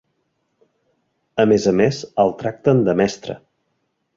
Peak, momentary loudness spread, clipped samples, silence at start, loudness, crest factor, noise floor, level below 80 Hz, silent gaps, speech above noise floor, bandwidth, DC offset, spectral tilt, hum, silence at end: -2 dBFS; 15 LU; under 0.1%; 1.35 s; -18 LUFS; 18 dB; -71 dBFS; -54 dBFS; none; 54 dB; 7.6 kHz; under 0.1%; -6.5 dB/octave; none; 0.8 s